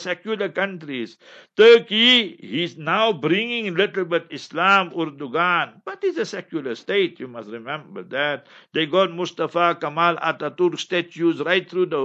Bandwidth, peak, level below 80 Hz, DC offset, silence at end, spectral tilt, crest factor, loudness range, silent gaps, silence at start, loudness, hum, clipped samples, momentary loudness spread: 7.8 kHz; -2 dBFS; -76 dBFS; under 0.1%; 0 s; -4.5 dB/octave; 20 dB; 7 LU; none; 0 s; -20 LUFS; none; under 0.1%; 17 LU